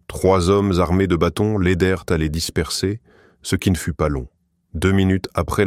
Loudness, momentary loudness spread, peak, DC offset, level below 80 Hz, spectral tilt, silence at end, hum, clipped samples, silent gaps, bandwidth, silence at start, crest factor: -19 LUFS; 8 LU; -2 dBFS; under 0.1%; -34 dBFS; -6 dB/octave; 0 s; none; under 0.1%; none; 16 kHz; 0.1 s; 16 dB